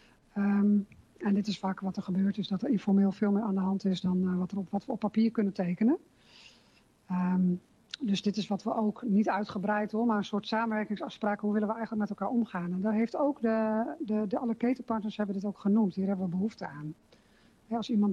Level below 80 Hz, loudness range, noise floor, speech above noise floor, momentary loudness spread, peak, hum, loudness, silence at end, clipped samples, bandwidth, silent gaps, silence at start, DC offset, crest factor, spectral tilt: -70 dBFS; 3 LU; -64 dBFS; 34 dB; 7 LU; -18 dBFS; none; -31 LUFS; 0 s; under 0.1%; 7.4 kHz; none; 0.35 s; under 0.1%; 12 dB; -7.5 dB/octave